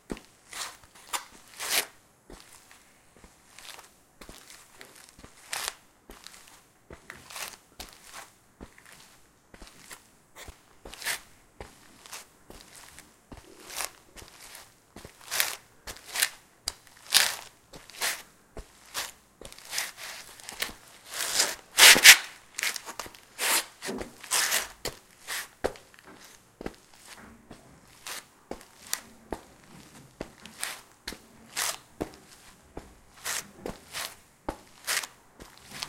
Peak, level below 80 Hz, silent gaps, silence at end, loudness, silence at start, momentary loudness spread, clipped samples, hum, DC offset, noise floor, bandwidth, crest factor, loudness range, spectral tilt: 0 dBFS; -58 dBFS; none; 0 s; -25 LUFS; 0.1 s; 22 LU; under 0.1%; none; under 0.1%; -58 dBFS; 17 kHz; 32 dB; 23 LU; 1 dB/octave